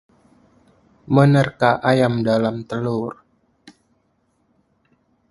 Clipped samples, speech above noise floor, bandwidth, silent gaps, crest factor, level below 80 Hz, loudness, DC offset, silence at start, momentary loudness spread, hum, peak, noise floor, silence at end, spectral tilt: under 0.1%; 48 dB; 11.5 kHz; none; 22 dB; -56 dBFS; -18 LUFS; under 0.1%; 1.1 s; 11 LU; none; 0 dBFS; -65 dBFS; 2.2 s; -7.5 dB/octave